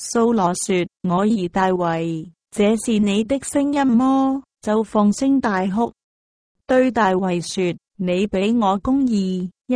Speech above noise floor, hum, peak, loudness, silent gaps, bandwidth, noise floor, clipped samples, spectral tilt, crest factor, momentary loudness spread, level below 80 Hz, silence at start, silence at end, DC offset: over 72 dB; none; -4 dBFS; -19 LUFS; 6.03-6.55 s; 10.5 kHz; under -90 dBFS; under 0.1%; -5.5 dB/octave; 14 dB; 7 LU; -50 dBFS; 0 s; 0 s; under 0.1%